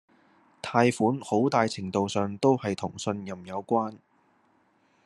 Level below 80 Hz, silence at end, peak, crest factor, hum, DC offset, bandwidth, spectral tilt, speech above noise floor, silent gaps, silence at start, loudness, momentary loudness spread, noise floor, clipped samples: -72 dBFS; 1.1 s; -4 dBFS; 24 dB; none; under 0.1%; 12 kHz; -6 dB/octave; 40 dB; none; 0.65 s; -27 LUFS; 12 LU; -66 dBFS; under 0.1%